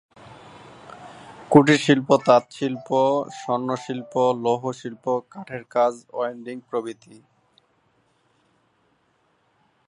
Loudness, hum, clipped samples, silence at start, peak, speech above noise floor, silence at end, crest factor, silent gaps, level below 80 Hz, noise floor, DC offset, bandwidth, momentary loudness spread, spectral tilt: -22 LUFS; none; under 0.1%; 0.85 s; 0 dBFS; 44 dB; 2.95 s; 24 dB; none; -68 dBFS; -66 dBFS; under 0.1%; 11 kHz; 24 LU; -6 dB/octave